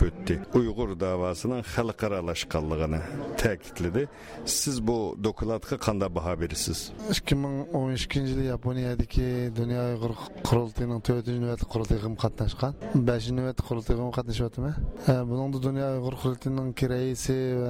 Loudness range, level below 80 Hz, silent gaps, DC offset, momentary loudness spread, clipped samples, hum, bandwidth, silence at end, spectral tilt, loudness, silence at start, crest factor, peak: 1 LU; -38 dBFS; none; under 0.1%; 5 LU; under 0.1%; none; 16 kHz; 0 s; -5.5 dB/octave; -29 LUFS; 0 s; 16 dB; -12 dBFS